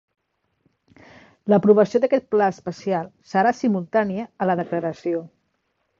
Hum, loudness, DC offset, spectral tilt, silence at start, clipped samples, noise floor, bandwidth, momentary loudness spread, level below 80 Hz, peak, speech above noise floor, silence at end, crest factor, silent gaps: none; -21 LUFS; under 0.1%; -7.5 dB/octave; 1.45 s; under 0.1%; -72 dBFS; 7.4 kHz; 11 LU; -64 dBFS; -4 dBFS; 51 dB; 0.75 s; 20 dB; none